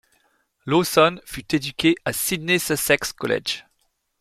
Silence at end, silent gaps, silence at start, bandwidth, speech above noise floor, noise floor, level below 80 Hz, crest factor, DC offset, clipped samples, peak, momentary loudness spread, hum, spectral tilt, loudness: 0.6 s; none; 0.65 s; 16 kHz; 48 dB; -69 dBFS; -54 dBFS; 20 dB; under 0.1%; under 0.1%; -4 dBFS; 10 LU; none; -3.5 dB/octave; -21 LUFS